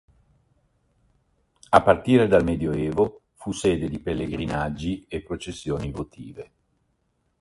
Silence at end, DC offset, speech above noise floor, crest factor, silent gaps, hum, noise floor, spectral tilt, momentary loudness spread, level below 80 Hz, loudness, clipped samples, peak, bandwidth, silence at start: 0.95 s; under 0.1%; 48 dB; 24 dB; none; none; -71 dBFS; -6.5 dB/octave; 17 LU; -44 dBFS; -24 LUFS; under 0.1%; 0 dBFS; 11.5 kHz; 1.7 s